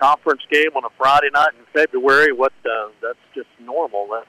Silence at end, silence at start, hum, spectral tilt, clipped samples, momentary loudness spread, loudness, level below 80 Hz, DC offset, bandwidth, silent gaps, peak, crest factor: 0.05 s; 0 s; none; -3.5 dB/octave; under 0.1%; 15 LU; -17 LUFS; -58 dBFS; under 0.1%; 15 kHz; none; -6 dBFS; 12 dB